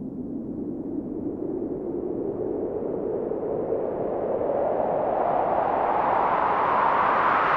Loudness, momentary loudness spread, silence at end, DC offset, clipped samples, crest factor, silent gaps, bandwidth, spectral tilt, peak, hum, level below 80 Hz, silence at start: -25 LUFS; 11 LU; 0 s; under 0.1%; under 0.1%; 14 dB; none; 6.6 kHz; -8.5 dB/octave; -10 dBFS; none; -52 dBFS; 0 s